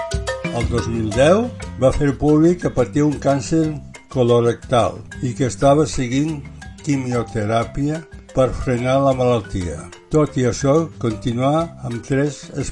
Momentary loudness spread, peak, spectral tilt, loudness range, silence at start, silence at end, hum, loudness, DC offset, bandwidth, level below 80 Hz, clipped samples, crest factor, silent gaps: 11 LU; 0 dBFS; -6.5 dB/octave; 3 LU; 0 s; 0 s; none; -19 LUFS; under 0.1%; 11 kHz; -36 dBFS; under 0.1%; 18 dB; none